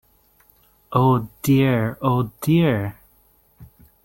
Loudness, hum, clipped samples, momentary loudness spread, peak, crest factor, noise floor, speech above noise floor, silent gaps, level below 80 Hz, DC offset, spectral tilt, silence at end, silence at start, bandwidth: -20 LUFS; none; under 0.1%; 7 LU; -4 dBFS; 18 dB; -58 dBFS; 39 dB; none; -50 dBFS; under 0.1%; -7.5 dB/octave; 0.4 s; 0.9 s; 17 kHz